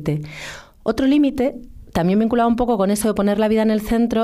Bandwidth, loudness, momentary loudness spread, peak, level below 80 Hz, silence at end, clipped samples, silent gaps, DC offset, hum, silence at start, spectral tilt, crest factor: 15.5 kHz; -19 LUFS; 11 LU; -8 dBFS; -40 dBFS; 0 s; under 0.1%; none; under 0.1%; none; 0 s; -6.5 dB/octave; 10 dB